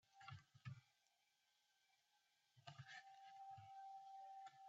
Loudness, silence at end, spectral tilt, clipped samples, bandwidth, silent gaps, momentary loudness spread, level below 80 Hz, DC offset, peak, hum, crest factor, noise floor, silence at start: -61 LUFS; 0 s; -3 dB/octave; under 0.1%; 7.6 kHz; none; 5 LU; under -90 dBFS; under 0.1%; -44 dBFS; none; 20 dB; -85 dBFS; 0.05 s